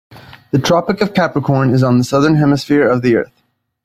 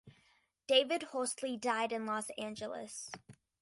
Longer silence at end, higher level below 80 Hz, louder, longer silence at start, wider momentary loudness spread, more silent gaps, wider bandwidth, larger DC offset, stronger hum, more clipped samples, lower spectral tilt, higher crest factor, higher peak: first, 0.6 s vs 0.3 s; first, -48 dBFS vs -78 dBFS; first, -14 LUFS vs -36 LUFS; about the same, 0.1 s vs 0.05 s; second, 5 LU vs 16 LU; neither; first, 14.5 kHz vs 11.5 kHz; neither; neither; neither; first, -7 dB/octave vs -2 dB/octave; second, 14 dB vs 22 dB; first, 0 dBFS vs -14 dBFS